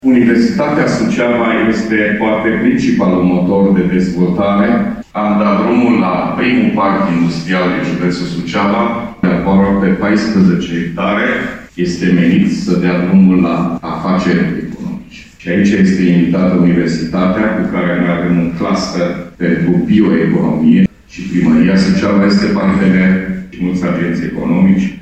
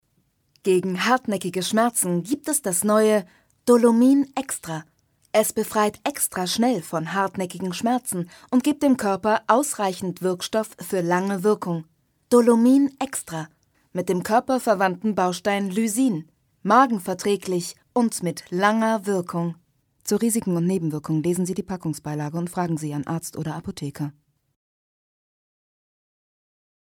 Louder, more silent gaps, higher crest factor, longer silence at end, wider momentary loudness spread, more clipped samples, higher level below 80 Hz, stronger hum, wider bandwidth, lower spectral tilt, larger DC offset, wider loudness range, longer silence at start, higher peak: first, -12 LUFS vs -23 LUFS; neither; second, 12 dB vs 20 dB; second, 0 s vs 2.8 s; second, 7 LU vs 12 LU; neither; first, -40 dBFS vs -64 dBFS; neither; second, 8.4 kHz vs 19.5 kHz; first, -7.5 dB/octave vs -5 dB/octave; first, 0.4% vs under 0.1%; second, 2 LU vs 8 LU; second, 0.05 s vs 0.65 s; first, 0 dBFS vs -4 dBFS